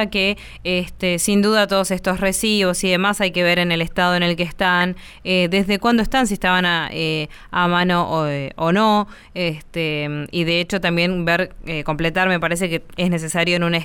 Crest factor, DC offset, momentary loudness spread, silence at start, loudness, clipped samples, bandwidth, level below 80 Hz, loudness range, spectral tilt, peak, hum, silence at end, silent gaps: 14 dB; under 0.1%; 8 LU; 0 s; -19 LUFS; under 0.1%; 19 kHz; -40 dBFS; 2 LU; -4.5 dB/octave; -4 dBFS; none; 0 s; none